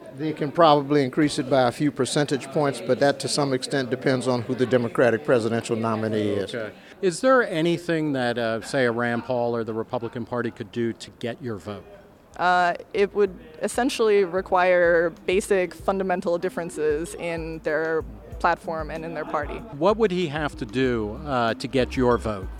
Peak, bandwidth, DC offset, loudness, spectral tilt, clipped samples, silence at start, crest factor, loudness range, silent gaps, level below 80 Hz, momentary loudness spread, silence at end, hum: -2 dBFS; 15.5 kHz; under 0.1%; -24 LUFS; -5.5 dB/octave; under 0.1%; 0 s; 20 dB; 5 LU; none; -46 dBFS; 10 LU; 0 s; none